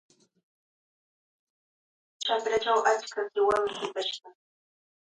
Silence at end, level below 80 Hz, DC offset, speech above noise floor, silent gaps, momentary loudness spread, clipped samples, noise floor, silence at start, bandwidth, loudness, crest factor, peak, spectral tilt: 0.75 s; -70 dBFS; under 0.1%; over 62 dB; none; 9 LU; under 0.1%; under -90 dBFS; 2.2 s; 11 kHz; -28 LUFS; 20 dB; -12 dBFS; -1.5 dB/octave